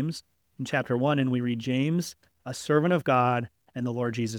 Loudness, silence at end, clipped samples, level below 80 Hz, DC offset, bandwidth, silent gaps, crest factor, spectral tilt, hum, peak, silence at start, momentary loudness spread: -27 LUFS; 0 s; under 0.1%; -68 dBFS; under 0.1%; 18 kHz; none; 18 dB; -6.5 dB/octave; none; -10 dBFS; 0 s; 15 LU